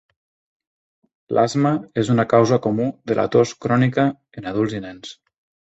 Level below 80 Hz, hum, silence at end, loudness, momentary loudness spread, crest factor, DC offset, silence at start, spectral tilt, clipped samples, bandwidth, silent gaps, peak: -56 dBFS; none; 0.55 s; -19 LUFS; 15 LU; 18 dB; under 0.1%; 1.3 s; -7 dB/octave; under 0.1%; 8.2 kHz; none; -2 dBFS